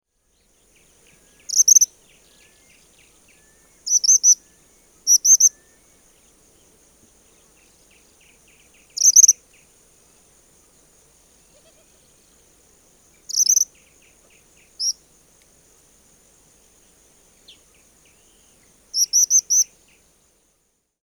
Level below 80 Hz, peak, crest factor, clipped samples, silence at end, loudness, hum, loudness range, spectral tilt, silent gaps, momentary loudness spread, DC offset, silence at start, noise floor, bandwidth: -66 dBFS; 0 dBFS; 24 dB; under 0.1%; 1.4 s; -14 LUFS; none; 13 LU; 4 dB/octave; none; 14 LU; under 0.1%; 1.5 s; -68 dBFS; over 20 kHz